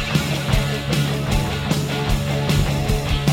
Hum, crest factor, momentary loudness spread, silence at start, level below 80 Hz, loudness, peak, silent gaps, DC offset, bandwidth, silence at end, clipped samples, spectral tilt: none; 14 dB; 2 LU; 0 s; -28 dBFS; -21 LUFS; -4 dBFS; none; under 0.1%; 16.5 kHz; 0 s; under 0.1%; -5 dB/octave